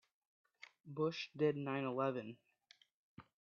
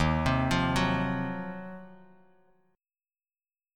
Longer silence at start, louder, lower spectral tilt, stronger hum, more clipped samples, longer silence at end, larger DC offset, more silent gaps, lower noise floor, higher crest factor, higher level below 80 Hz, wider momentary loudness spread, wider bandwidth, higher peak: first, 0.85 s vs 0 s; second, -40 LUFS vs -29 LUFS; about the same, -5 dB/octave vs -6 dB/octave; neither; neither; second, 0.25 s vs 1.8 s; neither; first, 2.92-3.17 s vs none; second, -71 dBFS vs under -90 dBFS; about the same, 20 dB vs 20 dB; second, -88 dBFS vs -44 dBFS; first, 23 LU vs 17 LU; second, 7 kHz vs 16.5 kHz; second, -24 dBFS vs -12 dBFS